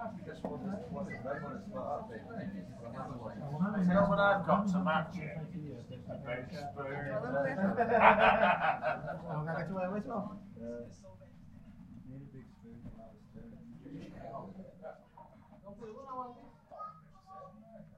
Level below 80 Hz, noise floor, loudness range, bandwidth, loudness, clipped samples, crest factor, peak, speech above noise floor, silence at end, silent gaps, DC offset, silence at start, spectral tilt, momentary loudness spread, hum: -60 dBFS; -57 dBFS; 20 LU; 8.6 kHz; -34 LUFS; under 0.1%; 26 dB; -10 dBFS; 23 dB; 0.1 s; none; under 0.1%; 0 s; -7.5 dB/octave; 25 LU; none